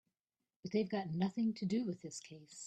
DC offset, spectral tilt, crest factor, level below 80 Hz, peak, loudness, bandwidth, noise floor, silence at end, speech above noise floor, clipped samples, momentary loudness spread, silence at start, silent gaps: under 0.1%; -6 dB/octave; 18 dB; -80 dBFS; -22 dBFS; -39 LUFS; 8.8 kHz; under -90 dBFS; 0 s; over 51 dB; under 0.1%; 14 LU; 0.65 s; none